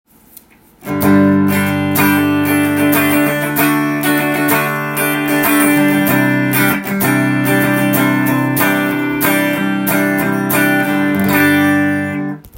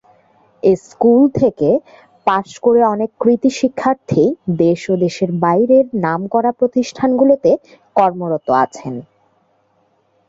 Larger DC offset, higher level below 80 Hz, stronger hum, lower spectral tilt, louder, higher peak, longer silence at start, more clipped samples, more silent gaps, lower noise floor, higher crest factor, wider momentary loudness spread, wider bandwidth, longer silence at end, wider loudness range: neither; about the same, -52 dBFS vs -54 dBFS; neither; second, -5 dB/octave vs -7 dB/octave; about the same, -13 LUFS vs -15 LUFS; about the same, 0 dBFS vs 0 dBFS; first, 0.8 s vs 0.65 s; neither; neither; second, -43 dBFS vs -59 dBFS; about the same, 14 dB vs 14 dB; second, 4 LU vs 7 LU; first, 17 kHz vs 7.8 kHz; second, 0 s vs 1.25 s; about the same, 1 LU vs 2 LU